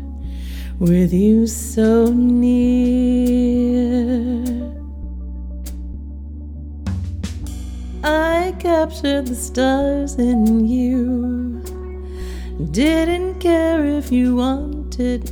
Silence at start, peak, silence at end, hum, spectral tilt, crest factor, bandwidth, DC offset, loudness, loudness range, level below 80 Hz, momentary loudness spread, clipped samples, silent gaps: 0 s; -4 dBFS; 0 s; none; -6.5 dB/octave; 14 dB; 18 kHz; under 0.1%; -18 LUFS; 10 LU; -28 dBFS; 16 LU; under 0.1%; none